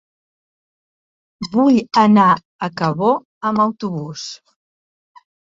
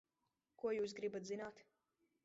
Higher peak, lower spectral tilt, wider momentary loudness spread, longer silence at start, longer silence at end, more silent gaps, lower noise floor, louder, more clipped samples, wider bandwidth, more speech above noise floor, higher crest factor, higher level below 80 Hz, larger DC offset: first, -2 dBFS vs -30 dBFS; first, -6.5 dB/octave vs -4 dB/octave; first, 16 LU vs 7 LU; first, 1.4 s vs 0.65 s; first, 1.1 s vs 0.6 s; first, 2.45-2.59 s, 3.25-3.41 s vs none; about the same, under -90 dBFS vs -89 dBFS; first, -16 LUFS vs -45 LUFS; neither; about the same, 7.8 kHz vs 7.6 kHz; first, over 74 dB vs 45 dB; about the same, 16 dB vs 16 dB; first, -60 dBFS vs -86 dBFS; neither